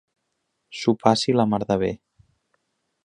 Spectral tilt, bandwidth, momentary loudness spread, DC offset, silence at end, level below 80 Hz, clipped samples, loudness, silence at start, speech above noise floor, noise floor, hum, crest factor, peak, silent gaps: -5.5 dB/octave; 10.5 kHz; 14 LU; under 0.1%; 1.1 s; -56 dBFS; under 0.1%; -22 LUFS; 0.7 s; 55 dB; -76 dBFS; none; 24 dB; 0 dBFS; none